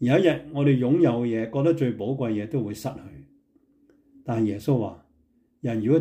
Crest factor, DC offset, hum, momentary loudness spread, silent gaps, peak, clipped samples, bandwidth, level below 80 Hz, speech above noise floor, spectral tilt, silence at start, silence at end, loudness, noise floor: 18 dB; under 0.1%; none; 13 LU; none; -8 dBFS; under 0.1%; 15.5 kHz; -60 dBFS; 41 dB; -8 dB/octave; 0 s; 0 s; -25 LUFS; -65 dBFS